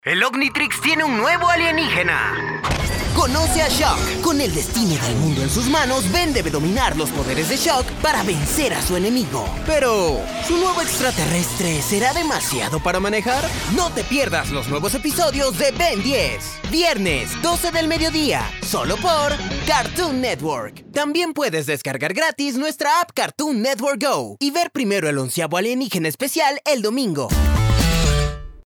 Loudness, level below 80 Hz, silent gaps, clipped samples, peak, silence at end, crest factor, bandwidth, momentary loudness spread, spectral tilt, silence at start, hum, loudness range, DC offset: -19 LUFS; -30 dBFS; none; under 0.1%; -2 dBFS; 0.05 s; 18 dB; over 20 kHz; 5 LU; -4 dB/octave; 0.05 s; none; 3 LU; under 0.1%